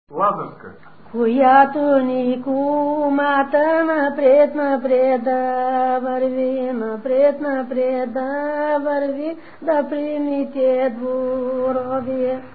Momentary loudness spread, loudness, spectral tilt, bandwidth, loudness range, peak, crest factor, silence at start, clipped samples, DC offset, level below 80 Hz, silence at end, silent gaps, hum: 9 LU; -19 LUFS; -10.5 dB/octave; 4.7 kHz; 4 LU; 0 dBFS; 18 dB; 0.1 s; under 0.1%; 0.7%; -62 dBFS; 0.05 s; none; none